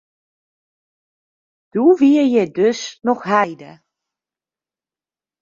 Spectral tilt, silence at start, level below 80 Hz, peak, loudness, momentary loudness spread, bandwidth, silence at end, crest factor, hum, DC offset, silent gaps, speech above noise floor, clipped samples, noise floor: -5.5 dB/octave; 1.75 s; -68 dBFS; -2 dBFS; -16 LUFS; 10 LU; 7.4 kHz; 1.7 s; 18 dB; none; under 0.1%; none; over 74 dB; under 0.1%; under -90 dBFS